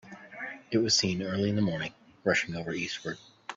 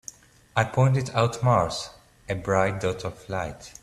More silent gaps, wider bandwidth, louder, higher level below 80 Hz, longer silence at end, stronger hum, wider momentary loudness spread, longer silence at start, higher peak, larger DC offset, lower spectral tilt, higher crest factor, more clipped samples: neither; second, 8 kHz vs 12.5 kHz; second, -29 LUFS vs -25 LUFS; second, -64 dBFS vs -52 dBFS; about the same, 0 s vs 0.1 s; neither; first, 15 LU vs 12 LU; second, 0.05 s vs 0.55 s; second, -12 dBFS vs -4 dBFS; neither; second, -4 dB/octave vs -6 dB/octave; about the same, 20 dB vs 22 dB; neither